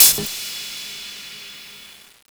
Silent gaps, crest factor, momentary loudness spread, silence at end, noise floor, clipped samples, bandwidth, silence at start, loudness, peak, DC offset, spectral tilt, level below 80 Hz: none; 22 dB; 17 LU; 0.45 s; -44 dBFS; under 0.1%; over 20 kHz; 0 s; -21 LUFS; 0 dBFS; under 0.1%; 0.5 dB/octave; -56 dBFS